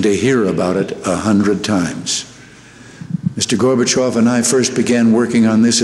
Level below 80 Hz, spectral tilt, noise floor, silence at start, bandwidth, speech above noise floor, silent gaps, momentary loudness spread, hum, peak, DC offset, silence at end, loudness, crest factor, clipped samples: -50 dBFS; -4.5 dB/octave; -40 dBFS; 0 s; 12.5 kHz; 26 dB; none; 8 LU; none; -4 dBFS; under 0.1%; 0 s; -15 LUFS; 12 dB; under 0.1%